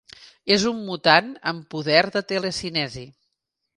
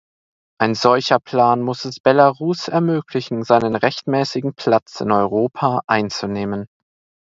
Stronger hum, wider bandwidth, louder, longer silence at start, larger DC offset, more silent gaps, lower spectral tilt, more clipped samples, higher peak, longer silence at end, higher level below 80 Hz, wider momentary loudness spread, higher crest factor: neither; first, 11.5 kHz vs 7.8 kHz; second, -21 LUFS vs -18 LUFS; second, 0.2 s vs 0.6 s; neither; second, none vs 2.00-2.04 s, 5.84-5.88 s; second, -4 dB/octave vs -6 dB/octave; neither; about the same, -2 dBFS vs 0 dBFS; about the same, 0.65 s vs 0.65 s; about the same, -58 dBFS vs -58 dBFS; first, 12 LU vs 9 LU; about the same, 22 dB vs 18 dB